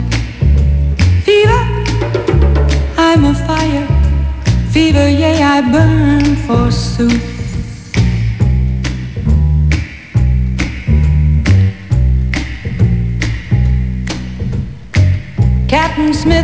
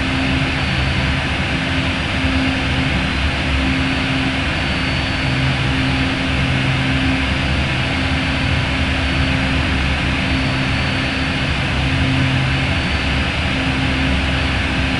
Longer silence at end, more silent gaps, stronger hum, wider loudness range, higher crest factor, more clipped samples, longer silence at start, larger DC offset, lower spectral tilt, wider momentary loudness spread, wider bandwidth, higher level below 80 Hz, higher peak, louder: about the same, 0 s vs 0 s; neither; neither; first, 4 LU vs 0 LU; about the same, 10 dB vs 12 dB; neither; about the same, 0 s vs 0 s; neither; first, -7 dB/octave vs -5.5 dB/octave; first, 9 LU vs 1 LU; second, 8 kHz vs 11 kHz; first, -16 dBFS vs -26 dBFS; first, 0 dBFS vs -4 dBFS; first, -13 LUFS vs -17 LUFS